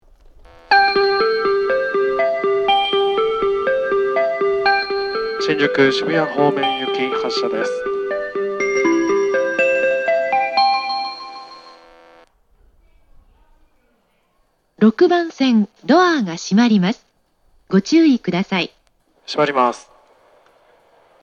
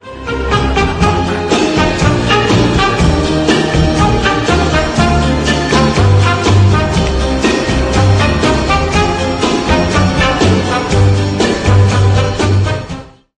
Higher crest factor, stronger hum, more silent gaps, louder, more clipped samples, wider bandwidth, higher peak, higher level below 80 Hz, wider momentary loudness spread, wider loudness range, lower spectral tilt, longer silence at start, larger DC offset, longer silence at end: first, 18 dB vs 10 dB; neither; neither; second, -17 LUFS vs -12 LUFS; neither; second, 8.8 kHz vs 10 kHz; about the same, -2 dBFS vs 0 dBFS; second, -54 dBFS vs -22 dBFS; first, 8 LU vs 4 LU; first, 5 LU vs 1 LU; about the same, -5.5 dB/octave vs -5.5 dB/octave; first, 0.7 s vs 0.05 s; neither; first, 1.4 s vs 0.3 s